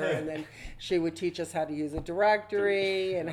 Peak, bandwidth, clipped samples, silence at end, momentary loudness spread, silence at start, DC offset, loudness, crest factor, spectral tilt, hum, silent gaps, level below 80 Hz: -12 dBFS; 13.5 kHz; under 0.1%; 0 s; 12 LU; 0 s; under 0.1%; -29 LUFS; 16 dB; -5 dB/octave; none; none; -52 dBFS